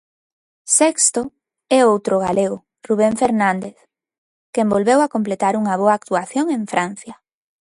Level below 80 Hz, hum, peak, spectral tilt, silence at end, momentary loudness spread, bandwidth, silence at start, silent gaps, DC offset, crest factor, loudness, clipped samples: -58 dBFS; none; -2 dBFS; -4 dB/octave; 0.6 s; 12 LU; 11.5 kHz; 0.65 s; 4.18-4.53 s; under 0.1%; 18 dB; -17 LUFS; under 0.1%